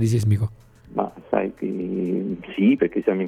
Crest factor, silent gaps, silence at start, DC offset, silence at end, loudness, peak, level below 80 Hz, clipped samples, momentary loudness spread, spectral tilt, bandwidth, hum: 18 dB; none; 0 s; under 0.1%; 0 s; -23 LUFS; -6 dBFS; -54 dBFS; under 0.1%; 9 LU; -8 dB/octave; 12.5 kHz; none